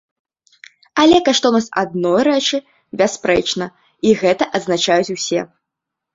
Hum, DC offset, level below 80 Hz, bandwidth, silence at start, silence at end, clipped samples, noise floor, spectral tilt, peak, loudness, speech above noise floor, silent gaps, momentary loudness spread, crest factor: none; under 0.1%; -52 dBFS; 7.8 kHz; 0.95 s; 0.7 s; under 0.1%; -81 dBFS; -3.5 dB/octave; 0 dBFS; -16 LUFS; 65 dB; none; 11 LU; 16 dB